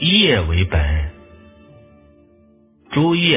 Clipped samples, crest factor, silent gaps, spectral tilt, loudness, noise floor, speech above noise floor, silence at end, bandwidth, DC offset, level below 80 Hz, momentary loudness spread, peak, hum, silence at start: under 0.1%; 16 dB; none; -10 dB/octave; -17 LUFS; -52 dBFS; 37 dB; 0 s; 3.9 kHz; under 0.1%; -26 dBFS; 11 LU; -2 dBFS; none; 0 s